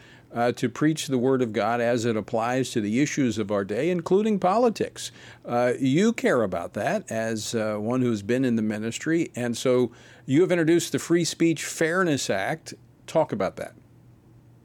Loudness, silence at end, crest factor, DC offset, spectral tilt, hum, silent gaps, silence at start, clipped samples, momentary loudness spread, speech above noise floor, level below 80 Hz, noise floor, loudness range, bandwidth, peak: -25 LUFS; 0.95 s; 16 dB; under 0.1%; -5.5 dB/octave; none; none; 0.3 s; under 0.1%; 8 LU; 29 dB; -66 dBFS; -53 dBFS; 2 LU; 18 kHz; -10 dBFS